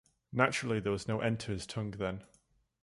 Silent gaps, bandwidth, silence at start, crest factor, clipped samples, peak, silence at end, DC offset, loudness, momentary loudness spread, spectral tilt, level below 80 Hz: none; 11.5 kHz; 0.3 s; 24 dB; under 0.1%; -12 dBFS; 0.55 s; under 0.1%; -34 LUFS; 9 LU; -5.5 dB/octave; -58 dBFS